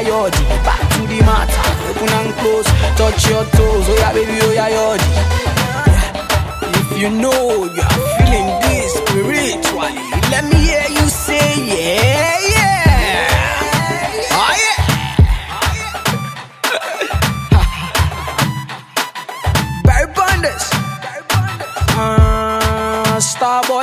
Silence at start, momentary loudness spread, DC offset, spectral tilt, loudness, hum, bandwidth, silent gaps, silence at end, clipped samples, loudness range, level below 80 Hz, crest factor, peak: 0 s; 6 LU; under 0.1%; -4.5 dB/octave; -14 LUFS; none; 16 kHz; none; 0 s; under 0.1%; 4 LU; -20 dBFS; 14 dB; 0 dBFS